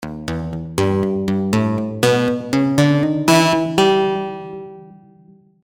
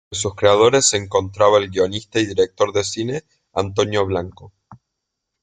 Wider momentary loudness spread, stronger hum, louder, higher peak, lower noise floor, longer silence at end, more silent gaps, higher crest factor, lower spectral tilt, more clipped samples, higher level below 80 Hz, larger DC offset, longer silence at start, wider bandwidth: about the same, 13 LU vs 12 LU; neither; about the same, -17 LUFS vs -18 LUFS; about the same, -2 dBFS vs -2 dBFS; second, -49 dBFS vs -79 dBFS; about the same, 0.75 s vs 0.65 s; neither; about the same, 16 dB vs 18 dB; first, -5.5 dB/octave vs -3.5 dB/octave; neither; first, -46 dBFS vs -56 dBFS; neither; about the same, 0 s vs 0.1 s; first, 19.5 kHz vs 9.8 kHz